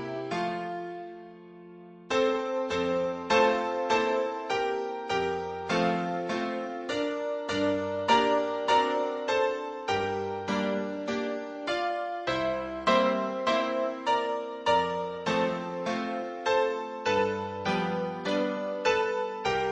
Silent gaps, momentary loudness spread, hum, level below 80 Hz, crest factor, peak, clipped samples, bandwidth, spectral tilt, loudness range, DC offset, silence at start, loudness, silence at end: none; 8 LU; none; -62 dBFS; 18 dB; -10 dBFS; under 0.1%; 9.8 kHz; -4.5 dB/octave; 3 LU; under 0.1%; 0 s; -29 LUFS; 0 s